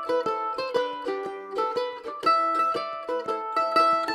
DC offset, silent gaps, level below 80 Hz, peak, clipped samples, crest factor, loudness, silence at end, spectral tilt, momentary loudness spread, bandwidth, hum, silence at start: under 0.1%; none; -70 dBFS; -10 dBFS; under 0.1%; 18 dB; -26 LUFS; 0 s; -3.5 dB/octave; 10 LU; 13.5 kHz; none; 0 s